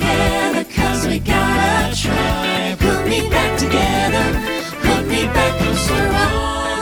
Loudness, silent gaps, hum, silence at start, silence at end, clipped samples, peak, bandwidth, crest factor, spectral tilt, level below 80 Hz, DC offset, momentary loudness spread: -17 LUFS; none; none; 0 s; 0 s; under 0.1%; -2 dBFS; over 20 kHz; 16 dB; -4.5 dB/octave; -26 dBFS; under 0.1%; 3 LU